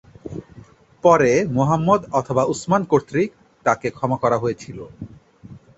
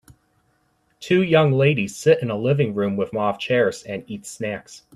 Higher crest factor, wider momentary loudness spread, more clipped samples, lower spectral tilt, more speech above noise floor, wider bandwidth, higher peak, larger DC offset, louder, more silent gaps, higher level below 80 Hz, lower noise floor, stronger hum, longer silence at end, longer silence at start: about the same, 20 dB vs 18 dB; first, 20 LU vs 15 LU; neither; about the same, -6.5 dB/octave vs -6 dB/octave; second, 28 dB vs 45 dB; second, 8.2 kHz vs 13 kHz; about the same, -2 dBFS vs -2 dBFS; neither; about the same, -19 LUFS vs -20 LUFS; neither; first, -52 dBFS vs -60 dBFS; second, -46 dBFS vs -65 dBFS; neither; about the same, 0.2 s vs 0.2 s; second, 0.25 s vs 1 s